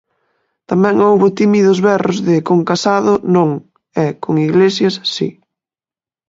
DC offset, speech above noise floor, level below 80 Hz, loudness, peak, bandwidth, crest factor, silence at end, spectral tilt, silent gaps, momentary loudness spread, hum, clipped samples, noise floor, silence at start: under 0.1%; over 78 dB; -58 dBFS; -13 LUFS; 0 dBFS; 7.8 kHz; 14 dB; 0.95 s; -6.5 dB/octave; none; 8 LU; none; under 0.1%; under -90 dBFS; 0.7 s